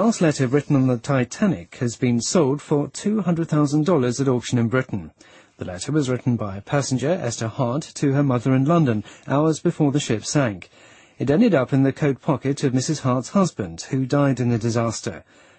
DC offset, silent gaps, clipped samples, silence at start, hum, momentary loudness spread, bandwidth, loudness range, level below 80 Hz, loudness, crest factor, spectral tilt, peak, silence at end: under 0.1%; none; under 0.1%; 0 s; none; 8 LU; 8.8 kHz; 3 LU; -56 dBFS; -21 LUFS; 16 dB; -6 dB/octave; -4 dBFS; 0.4 s